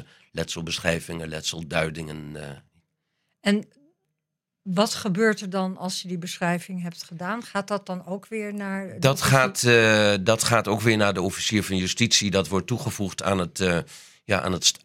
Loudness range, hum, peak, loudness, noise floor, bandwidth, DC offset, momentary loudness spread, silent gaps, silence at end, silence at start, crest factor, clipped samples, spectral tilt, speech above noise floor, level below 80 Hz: 10 LU; none; -2 dBFS; -24 LUFS; -83 dBFS; 16.5 kHz; under 0.1%; 14 LU; none; 0.1 s; 0 s; 22 dB; under 0.1%; -4 dB/octave; 59 dB; -58 dBFS